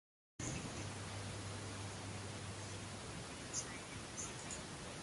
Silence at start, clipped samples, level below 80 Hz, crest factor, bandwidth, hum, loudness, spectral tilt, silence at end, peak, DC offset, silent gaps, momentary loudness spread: 0.4 s; under 0.1%; -62 dBFS; 18 dB; 11.5 kHz; none; -46 LUFS; -3.5 dB/octave; 0 s; -30 dBFS; under 0.1%; none; 4 LU